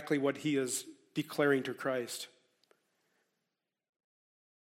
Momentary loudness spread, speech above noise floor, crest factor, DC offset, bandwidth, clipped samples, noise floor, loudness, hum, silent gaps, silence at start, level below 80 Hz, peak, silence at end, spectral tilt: 11 LU; 54 dB; 22 dB; under 0.1%; 16.5 kHz; under 0.1%; -88 dBFS; -34 LUFS; none; none; 0 s; -86 dBFS; -16 dBFS; 2.5 s; -4 dB/octave